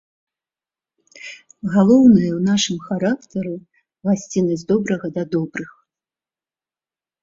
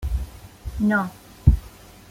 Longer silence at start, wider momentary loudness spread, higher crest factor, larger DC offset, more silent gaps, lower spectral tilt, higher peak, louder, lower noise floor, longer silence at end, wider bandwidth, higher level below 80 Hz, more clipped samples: first, 1.25 s vs 0 s; first, 23 LU vs 17 LU; about the same, 18 dB vs 22 dB; neither; neither; second, -6 dB/octave vs -8 dB/octave; about the same, -2 dBFS vs -2 dBFS; first, -18 LUFS vs -23 LUFS; first, under -90 dBFS vs -45 dBFS; first, 1.5 s vs 0.4 s; second, 7.8 kHz vs 16 kHz; second, -56 dBFS vs -28 dBFS; neither